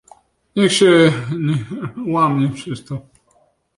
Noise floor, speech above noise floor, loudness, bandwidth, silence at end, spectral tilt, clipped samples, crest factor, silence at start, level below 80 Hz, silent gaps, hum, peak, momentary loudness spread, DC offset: -59 dBFS; 43 dB; -16 LUFS; 11.5 kHz; 0.75 s; -5.5 dB/octave; under 0.1%; 16 dB; 0.55 s; -56 dBFS; none; none; -2 dBFS; 17 LU; under 0.1%